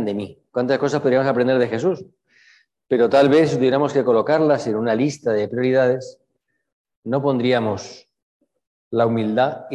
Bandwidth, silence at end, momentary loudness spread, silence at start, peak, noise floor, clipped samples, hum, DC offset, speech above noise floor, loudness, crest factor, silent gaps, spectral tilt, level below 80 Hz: 10 kHz; 0 s; 11 LU; 0 s; -4 dBFS; -74 dBFS; under 0.1%; none; under 0.1%; 55 dB; -19 LUFS; 16 dB; 6.72-6.85 s, 6.97-7.03 s, 8.22-8.40 s, 8.67-8.91 s; -6.5 dB/octave; -62 dBFS